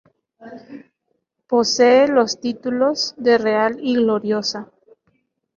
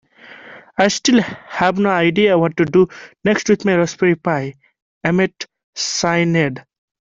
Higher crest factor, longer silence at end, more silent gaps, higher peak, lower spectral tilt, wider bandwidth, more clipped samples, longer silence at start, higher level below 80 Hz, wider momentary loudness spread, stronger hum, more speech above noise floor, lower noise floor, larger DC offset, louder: about the same, 16 dB vs 16 dB; first, 0.9 s vs 0.45 s; second, none vs 4.82-5.01 s, 5.64-5.73 s; about the same, -2 dBFS vs 0 dBFS; second, -3.5 dB/octave vs -5 dB/octave; about the same, 7.4 kHz vs 7.8 kHz; neither; about the same, 0.4 s vs 0.3 s; second, -64 dBFS vs -54 dBFS; about the same, 11 LU vs 11 LU; neither; first, 55 dB vs 25 dB; first, -72 dBFS vs -41 dBFS; neither; about the same, -18 LUFS vs -17 LUFS